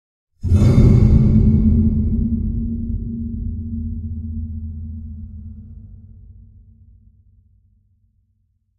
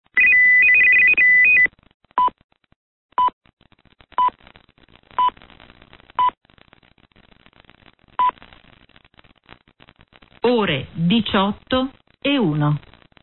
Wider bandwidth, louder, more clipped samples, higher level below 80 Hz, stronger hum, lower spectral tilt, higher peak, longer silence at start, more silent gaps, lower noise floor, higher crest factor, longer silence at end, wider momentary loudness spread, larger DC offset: first, 7.2 kHz vs 4.3 kHz; about the same, -18 LUFS vs -16 LUFS; neither; first, -26 dBFS vs -52 dBFS; neither; about the same, -10 dB/octave vs -10 dB/octave; first, 0 dBFS vs -6 dBFS; first, 0.45 s vs 0.15 s; second, none vs 1.94-2.00 s, 2.44-2.49 s, 2.76-3.09 s, 3.33-3.41 s, 3.53-3.57 s, 6.37-6.41 s; first, -65 dBFS vs -55 dBFS; about the same, 18 dB vs 14 dB; first, 2.45 s vs 0.45 s; first, 22 LU vs 16 LU; second, under 0.1% vs 0.1%